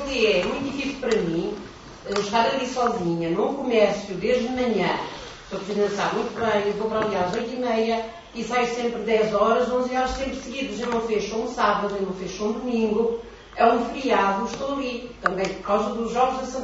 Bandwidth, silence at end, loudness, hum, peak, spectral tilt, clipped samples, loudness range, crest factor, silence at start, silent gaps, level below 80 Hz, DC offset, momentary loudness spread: 8 kHz; 0 s; -24 LUFS; none; -4 dBFS; -5 dB/octave; under 0.1%; 2 LU; 20 dB; 0 s; none; -48 dBFS; under 0.1%; 9 LU